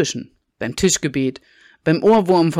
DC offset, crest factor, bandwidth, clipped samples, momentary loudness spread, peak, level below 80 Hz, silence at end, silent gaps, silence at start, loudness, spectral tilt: under 0.1%; 12 dB; 15 kHz; under 0.1%; 13 LU; -6 dBFS; -48 dBFS; 0 s; none; 0 s; -18 LUFS; -4.5 dB/octave